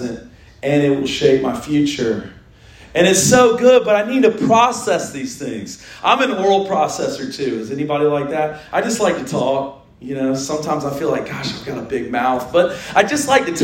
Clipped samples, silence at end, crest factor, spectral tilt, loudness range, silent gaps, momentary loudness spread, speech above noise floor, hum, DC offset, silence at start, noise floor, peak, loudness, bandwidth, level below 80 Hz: under 0.1%; 0 s; 16 dB; -4 dB/octave; 6 LU; none; 13 LU; 26 dB; none; under 0.1%; 0 s; -43 dBFS; 0 dBFS; -17 LUFS; 16.5 kHz; -50 dBFS